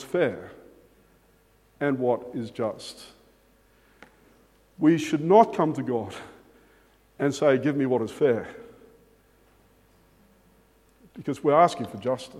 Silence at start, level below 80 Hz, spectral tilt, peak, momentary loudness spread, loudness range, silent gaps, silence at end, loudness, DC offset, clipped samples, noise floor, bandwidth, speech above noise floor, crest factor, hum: 0 s; -66 dBFS; -6.5 dB/octave; -4 dBFS; 21 LU; 8 LU; none; 0 s; -24 LUFS; under 0.1%; under 0.1%; -61 dBFS; 14.5 kHz; 37 dB; 24 dB; none